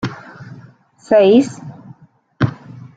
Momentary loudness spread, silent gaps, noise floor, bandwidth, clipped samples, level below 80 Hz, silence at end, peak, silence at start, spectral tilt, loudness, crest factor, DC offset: 26 LU; none; -45 dBFS; 9.2 kHz; under 0.1%; -54 dBFS; 0.15 s; -2 dBFS; 0.05 s; -7 dB/octave; -15 LUFS; 16 dB; under 0.1%